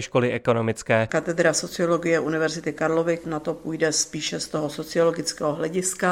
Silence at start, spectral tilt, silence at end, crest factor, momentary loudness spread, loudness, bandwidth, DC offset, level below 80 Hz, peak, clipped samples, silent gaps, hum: 0 s; -4 dB/octave; 0 s; 18 dB; 6 LU; -24 LUFS; 16 kHz; under 0.1%; -58 dBFS; -6 dBFS; under 0.1%; none; none